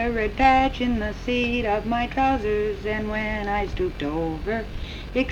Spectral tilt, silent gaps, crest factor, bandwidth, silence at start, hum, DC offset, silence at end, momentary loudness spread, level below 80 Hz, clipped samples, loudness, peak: -6.5 dB/octave; none; 16 dB; 12 kHz; 0 s; none; under 0.1%; 0 s; 9 LU; -34 dBFS; under 0.1%; -24 LUFS; -6 dBFS